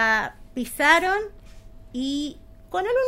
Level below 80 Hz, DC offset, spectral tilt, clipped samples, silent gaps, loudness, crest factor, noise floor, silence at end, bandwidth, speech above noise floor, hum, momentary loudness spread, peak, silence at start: -46 dBFS; under 0.1%; -3 dB/octave; under 0.1%; none; -23 LUFS; 22 dB; -43 dBFS; 0 s; 16 kHz; 21 dB; 50 Hz at -55 dBFS; 16 LU; -2 dBFS; 0 s